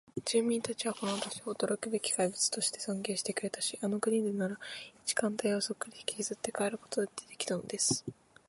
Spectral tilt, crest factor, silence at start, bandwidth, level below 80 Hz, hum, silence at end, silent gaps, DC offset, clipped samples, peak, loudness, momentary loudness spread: -3 dB/octave; 20 dB; 0.15 s; 12 kHz; -74 dBFS; none; 0.35 s; none; under 0.1%; under 0.1%; -16 dBFS; -34 LUFS; 8 LU